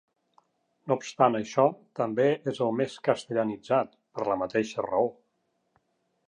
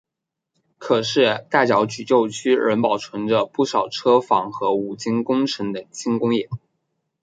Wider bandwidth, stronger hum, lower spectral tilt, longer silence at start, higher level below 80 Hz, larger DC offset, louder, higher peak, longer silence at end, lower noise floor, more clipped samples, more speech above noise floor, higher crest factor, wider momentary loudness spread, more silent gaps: about the same, 10 kHz vs 9.4 kHz; neither; about the same, -6 dB/octave vs -5 dB/octave; about the same, 0.85 s vs 0.8 s; second, -72 dBFS vs -64 dBFS; neither; second, -28 LUFS vs -20 LUFS; second, -6 dBFS vs -2 dBFS; first, 1.15 s vs 0.65 s; second, -75 dBFS vs -83 dBFS; neither; second, 49 dB vs 64 dB; about the same, 22 dB vs 20 dB; about the same, 6 LU vs 7 LU; neither